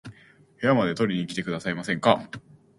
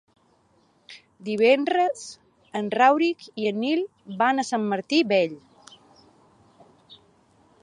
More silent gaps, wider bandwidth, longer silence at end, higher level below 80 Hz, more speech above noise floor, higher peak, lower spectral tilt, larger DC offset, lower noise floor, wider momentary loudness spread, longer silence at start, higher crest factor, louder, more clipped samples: neither; about the same, 11.5 kHz vs 11 kHz; second, 0.4 s vs 0.7 s; first, -62 dBFS vs -76 dBFS; second, 29 dB vs 40 dB; about the same, -4 dBFS vs -6 dBFS; first, -6 dB/octave vs -4.5 dB/octave; neither; second, -54 dBFS vs -63 dBFS; second, 7 LU vs 15 LU; second, 0.05 s vs 0.9 s; about the same, 24 dB vs 20 dB; about the same, -25 LUFS vs -23 LUFS; neither